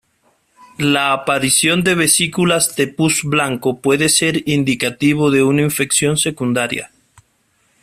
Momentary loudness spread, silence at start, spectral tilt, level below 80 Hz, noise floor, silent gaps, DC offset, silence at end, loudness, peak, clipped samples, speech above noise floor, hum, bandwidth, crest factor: 6 LU; 0.8 s; -3.5 dB/octave; -52 dBFS; -61 dBFS; none; under 0.1%; 0.95 s; -15 LUFS; 0 dBFS; under 0.1%; 45 dB; none; 16 kHz; 16 dB